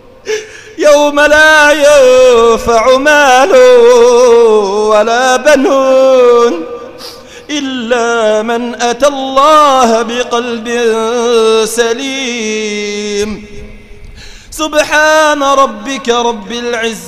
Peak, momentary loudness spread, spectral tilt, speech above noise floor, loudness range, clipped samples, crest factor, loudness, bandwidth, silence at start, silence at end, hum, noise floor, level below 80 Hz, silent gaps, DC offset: 0 dBFS; 13 LU; -2.5 dB/octave; 22 dB; 8 LU; 0.8%; 8 dB; -8 LUFS; 15.5 kHz; 0.25 s; 0 s; none; -30 dBFS; -38 dBFS; none; under 0.1%